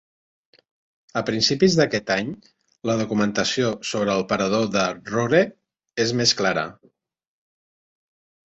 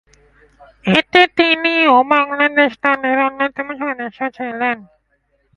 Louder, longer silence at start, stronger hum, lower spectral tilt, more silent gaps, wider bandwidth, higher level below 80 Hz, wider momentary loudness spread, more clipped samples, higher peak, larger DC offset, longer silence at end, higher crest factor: second, -22 LUFS vs -15 LUFS; first, 1.15 s vs 0.85 s; neither; second, -4 dB/octave vs -5.5 dB/octave; neither; second, 8.2 kHz vs 11 kHz; about the same, -58 dBFS vs -56 dBFS; about the same, 11 LU vs 12 LU; neither; about the same, -2 dBFS vs 0 dBFS; neither; first, 1.75 s vs 0.75 s; about the same, 20 dB vs 16 dB